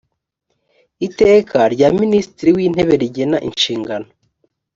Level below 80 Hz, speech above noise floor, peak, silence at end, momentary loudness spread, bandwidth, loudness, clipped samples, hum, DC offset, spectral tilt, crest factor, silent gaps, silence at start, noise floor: -48 dBFS; 57 dB; -2 dBFS; 0.75 s; 13 LU; 7.6 kHz; -15 LUFS; under 0.1%; none; under 0.1%; -5.5 dB/octave; 14 dB; none; 1 s; -71 dBFS